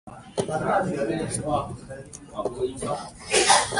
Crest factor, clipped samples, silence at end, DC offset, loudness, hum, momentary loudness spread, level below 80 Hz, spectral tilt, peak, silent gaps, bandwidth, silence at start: 22 dB; under 0.1%; 0 s; under 0.1%; -25 LUFS; none; 17 LU; -50 dBFS; -3 dB/octave; -4 dBFS; none; 11.5 kHz; 0.05 s